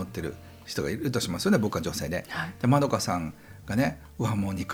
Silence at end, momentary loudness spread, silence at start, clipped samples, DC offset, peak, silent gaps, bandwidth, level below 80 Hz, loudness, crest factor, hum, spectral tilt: 0 s; 12 LU; 0 s; under 0.1%; under 0.1%; -10 dBFS; none; over 20 kHz; -52 dBFS; -28 LUFS; 18 dB; none; -5.5 dB/octave